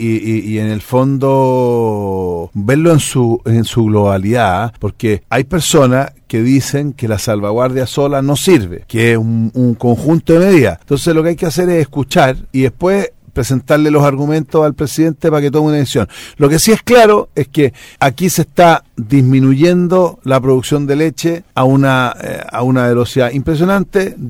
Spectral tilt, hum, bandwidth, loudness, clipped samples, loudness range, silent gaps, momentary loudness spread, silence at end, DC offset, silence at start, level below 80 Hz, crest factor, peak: -6 dB/octave; none; 16.5 kHz; -12 LUFS; under 0.1%; 2 LU; none; 8 LU; 0 s; under 0.1%; 0 s; -38 dBFS; 12 dB; 0 dBFS